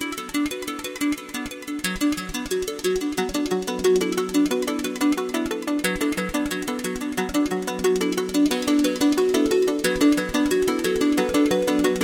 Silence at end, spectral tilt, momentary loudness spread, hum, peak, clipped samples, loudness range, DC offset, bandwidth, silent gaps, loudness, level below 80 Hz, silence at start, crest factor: 0 s; -4 dB/octave; 7 LU; none; -4 dBFS; under 0.1%; 5 LU; under 0.1%; 17 kHz; none; -23 LUFS; -46 dBFS; 0 s; 20 dB